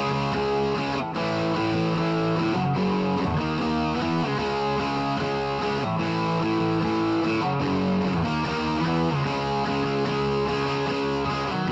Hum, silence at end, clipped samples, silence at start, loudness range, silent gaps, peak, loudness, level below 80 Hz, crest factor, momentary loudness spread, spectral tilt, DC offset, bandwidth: none; 0 s; under 0.1%; 0 s; 1 LU; none; -14 dBFS; -25 LUFS; -46 dBFS; 10 dB; 2 LU; -6.5 dB/octave; under 0.1%; 8.2 kHz